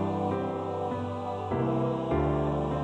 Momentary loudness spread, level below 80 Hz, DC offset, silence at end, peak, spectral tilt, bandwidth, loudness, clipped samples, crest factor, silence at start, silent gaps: 5 LU; -44 dBFS; under 0.1%; 0 s; -16 dBFS; -9 dB/octave; 9.2 kHz; -30 LUFS; under 0.1%; 14 dB; 0 s; none